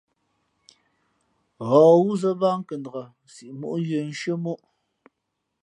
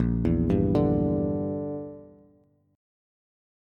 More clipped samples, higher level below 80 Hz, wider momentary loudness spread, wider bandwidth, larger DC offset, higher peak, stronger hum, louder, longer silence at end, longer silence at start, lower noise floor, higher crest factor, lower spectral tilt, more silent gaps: neither; second, -76 dBFS vs -40 dBFS; first, 20 LU vs 12 LU; first, 10.5 kHz vs 5.6 kHz; neither; first, -4 dBFS vs -10 dBFS; neither; first, -22 LUFS vs -26 LUFS; second, 1.05 s vs 1.7 s; first, 1.6 s vs 0 s; first, -79 dBFS vs -62 dBFS; about the same, 20 dB vs 16 dB; second, -7.5 dB/octave vs -11 dB/octave; neither